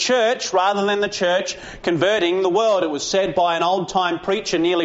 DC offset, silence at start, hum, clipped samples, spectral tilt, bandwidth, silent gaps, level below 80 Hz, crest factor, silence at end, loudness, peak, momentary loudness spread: under 0.1%; 0 s; none; under 0.1%; -2.5 dB/octave; 8 kHz; none; -54 dBFS; 14 dB; 0 s; -19 LUFS; -6 dBFS; 4 LU